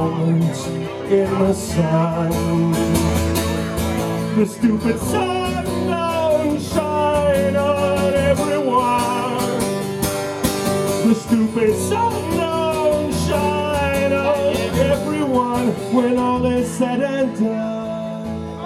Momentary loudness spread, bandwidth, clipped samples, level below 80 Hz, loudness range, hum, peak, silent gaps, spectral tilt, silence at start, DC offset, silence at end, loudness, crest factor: 5 LU; 16.5 kHz; under 0.1%; -38 dBFS; 2 LU; none; -4 dBFS; none; -6 dB/octave; 0 s; under 0.1%; 0 s; -19 LUFS; 14 dB